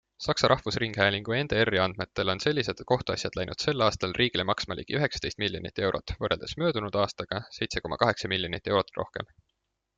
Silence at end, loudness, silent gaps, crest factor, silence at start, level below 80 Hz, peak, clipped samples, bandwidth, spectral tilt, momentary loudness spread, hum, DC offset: 0.75 s; -28 LUFS; none; 24 dB; 0.2 s; -52 dBFS; -4 dBFS; under 0.1%; 9.4 kHz; -4.5 dB/octave; 7 LU; none; under 0.1%